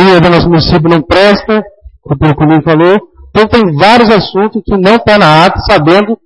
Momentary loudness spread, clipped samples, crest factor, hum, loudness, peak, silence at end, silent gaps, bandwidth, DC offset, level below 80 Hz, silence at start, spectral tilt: 7 LU; 3%; 6 dB; none; -7 LUFS; 0 dBFS; 0.1 s; none; 11 kHz; under 0.1%; -28 dBFS; 0 s; -7 dB/octave